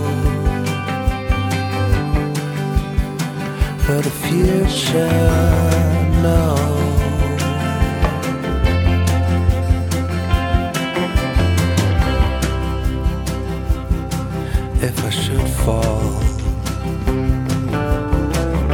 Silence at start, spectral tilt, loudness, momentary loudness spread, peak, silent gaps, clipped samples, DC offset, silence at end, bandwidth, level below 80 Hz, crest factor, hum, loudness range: 0 s; -6 dB/octave; -18 LUFS; 7 LU; -2 dBFS; none; under 0.1%; under 0.1%; 0 s; 18 kHz; -22 dBFS; 16 dB; none; 4 LU